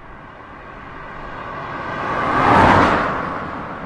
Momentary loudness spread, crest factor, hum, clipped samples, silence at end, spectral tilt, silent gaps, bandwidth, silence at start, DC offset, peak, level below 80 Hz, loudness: 25 LU; 18 dB; none; under 0.1%; 0 s; -6.5 dB/octave; none; 11.5 kHz; 0 s; under 0.1%; 0 dBFS; -40 dBFS; -17 LUFS